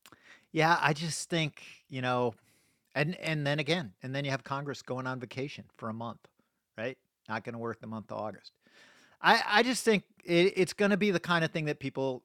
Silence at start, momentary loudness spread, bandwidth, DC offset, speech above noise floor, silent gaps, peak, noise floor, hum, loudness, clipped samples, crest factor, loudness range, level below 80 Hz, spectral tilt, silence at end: 0.3 s; 15 LU; 16 kHz; under 0.1%; 29 dB; none; -8 dBFS; -60 dBFS; none; -31 LUFS; under 0.1%; 24 dB; 12 LU; -74 dBFS; -4.5 dB/octave; 0.05 s